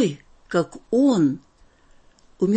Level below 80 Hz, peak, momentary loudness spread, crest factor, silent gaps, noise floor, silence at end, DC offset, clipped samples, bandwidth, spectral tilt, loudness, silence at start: -58 dBFS; -8 dBFS; 13 LU; 14 dB; none; -54 dBFS; 0 s; under 0.1%; under 0.1%; 8.8 kHz; -7 dB/octave; -22 LUFS; 0 s